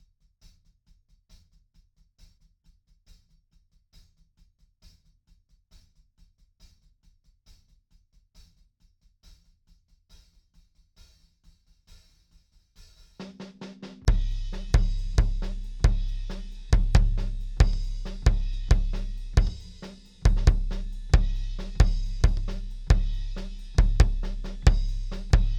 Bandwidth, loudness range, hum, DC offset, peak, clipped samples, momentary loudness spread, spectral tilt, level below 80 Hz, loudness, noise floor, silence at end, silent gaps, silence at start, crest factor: 8.8 kHz; 9 LU; none; under 0.1%; -4 dBFS; under 0.1%; 16 LU; -6 dB/octave; -28 dBFS; -28 LUFS; -64 dBFS; 0 s; none; 13.2 s; 22 dB